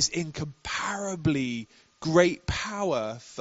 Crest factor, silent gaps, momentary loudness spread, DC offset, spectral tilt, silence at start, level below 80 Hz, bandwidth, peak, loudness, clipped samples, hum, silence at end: 22 dB; none; 13 LU; under 0.1%; -4 dB/octave; 0 s; -50 dBFS; 8 kHz; -6 dBFS; -28 LUFS; under 0.1%; none; 0 s